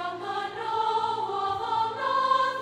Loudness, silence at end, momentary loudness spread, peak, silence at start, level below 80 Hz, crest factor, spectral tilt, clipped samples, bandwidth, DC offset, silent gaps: -27 LUFS; 0 s; 8 LU; -12 dBFS; 0 s; -66 dBFS; 16 dB; -3.5 dB/octave; under 0.1%; 11.5 kHz; under 0.1%; none